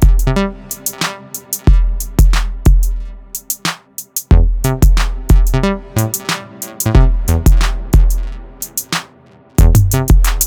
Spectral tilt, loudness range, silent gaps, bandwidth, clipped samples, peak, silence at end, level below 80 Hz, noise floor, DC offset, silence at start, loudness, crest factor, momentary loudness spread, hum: -5 dB/octave; 2 LU; none; over 20 kHz; under 0.1%; 0 dBFS; 0 s; -14 dBFS; -44 dBFS; under 0.1%; 0 s; -15 LUFS; 12 dB; 10 LU; none